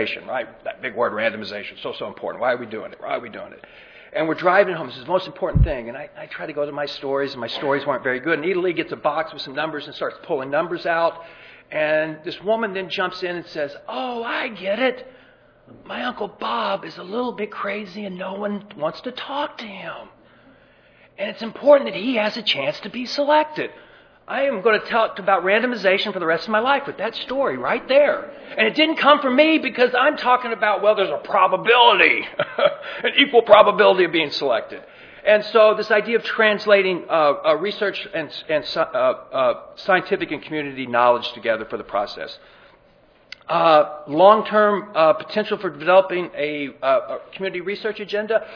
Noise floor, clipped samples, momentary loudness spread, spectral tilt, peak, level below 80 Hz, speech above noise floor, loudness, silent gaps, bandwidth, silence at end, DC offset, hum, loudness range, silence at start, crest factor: -54 dBFS; under 0.1%; 14 LU; -6 dB/octave; 0 dBFS; -42 dBFS; 34 dB; -20 LUFS; none; 5.4 kHz; 0 s; under 0.1%; none; 10 LU; 0 s; 20 dB